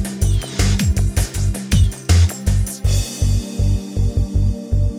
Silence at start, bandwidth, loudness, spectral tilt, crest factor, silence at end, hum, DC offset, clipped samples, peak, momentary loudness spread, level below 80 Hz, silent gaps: 0 s; 16 kHz; -19 LUFS; -5 dB/octave; 14 dB; 0 s; none; under 0.1%; under 0.1%; -4 dBFS; 5 LU; -20 dBFS; none